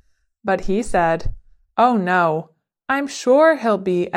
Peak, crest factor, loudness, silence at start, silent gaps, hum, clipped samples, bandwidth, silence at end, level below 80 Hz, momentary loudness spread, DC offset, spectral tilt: -2 dBFS; 16 dB; -18 LUFS; 0.45 s; none; none; under 0.1%; 13 kHz; 0 s; -36 dBFS; 13 LU; under 0.1%; -5.5 dB/octave